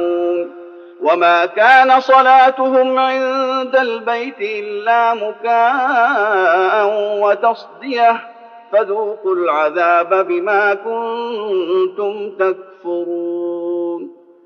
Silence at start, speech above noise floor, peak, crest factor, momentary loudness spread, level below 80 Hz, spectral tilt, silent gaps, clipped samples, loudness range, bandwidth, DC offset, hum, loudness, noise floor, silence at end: 0 s; 21 dB; 0 dBFS; 14 dB; 12 LU; -76 dBFS; 0 dB/octave; none; under 0.1%; 6 LU; 6.8 kHz; under 0.1%; none; -15 LUFS; -36 dBFS; 0.35 s